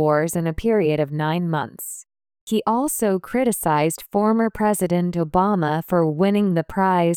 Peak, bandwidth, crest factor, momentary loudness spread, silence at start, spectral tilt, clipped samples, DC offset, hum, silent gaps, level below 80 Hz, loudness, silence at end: -6 dBFS; 19.5 kHz; 14 dB; 5 LU; 0 s; -6 dB/octave; under 0.1%; under 0.1%; none; 2.41-2.47 s; -46 dBFS; -21 LUFS; 0 s